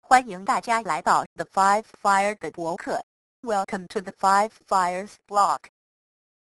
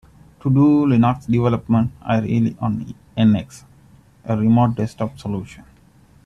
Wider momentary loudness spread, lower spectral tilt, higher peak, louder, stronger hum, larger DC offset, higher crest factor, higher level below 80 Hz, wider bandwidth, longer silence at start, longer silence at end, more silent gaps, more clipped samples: second, 10 LU vs 14 LU; second, -3.5 dB/octave vs -9 dB/octave; about the same, -2 dBFS vs -4 dBFS; second, -24 LUFS vs -19 LUFS; neither; neither; first, 22 dB vs 14 dB; second, -64 dBFS vs -48 dBFS; first, 12 kHz vs 10 kHz; second, 0.1 s vs 0.45 s; first, 1 s vs 0.65 s; first, 1.26-1.36 s, 3.03-3.43 s vs none; neither